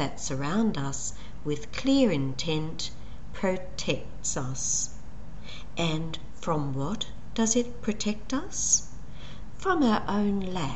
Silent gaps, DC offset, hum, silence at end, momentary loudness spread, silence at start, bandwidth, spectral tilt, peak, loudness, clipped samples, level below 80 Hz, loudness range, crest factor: none; 2%; none; 0 s; 19 LU; 0 s; 8.4 kHz; -4 dB/octave; -10 dBFS; -29 LUFS; under 0.1%; -46 dBFS; 4 LU; 20 dB